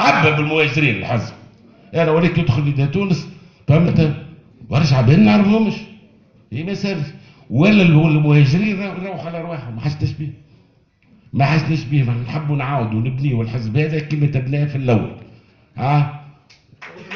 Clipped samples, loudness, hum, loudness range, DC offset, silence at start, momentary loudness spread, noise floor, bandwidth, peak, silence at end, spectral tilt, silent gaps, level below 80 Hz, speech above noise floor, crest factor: under 0.1%; -17 LUFS; none; 5 LU; under 0.1%; 0 s; 15 LU; -55 dBFS; 6.8 kHz; 0 dBFS; 0 s; -8 dB/octave; none; -44 dBFS; 39 dB; 16 dB